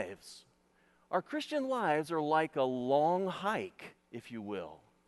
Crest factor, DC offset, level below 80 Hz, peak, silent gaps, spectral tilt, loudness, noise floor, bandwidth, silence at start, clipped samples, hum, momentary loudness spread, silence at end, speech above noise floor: 18 dB; under 0.1%; -78 dBFS; -18 dBFS; none; -5.5 dB/octave; -34 LUFS; -70 dBFS; 12 kHz; 0 s; under 0.1%; none; 19 LU; 0.3 s; 36 dB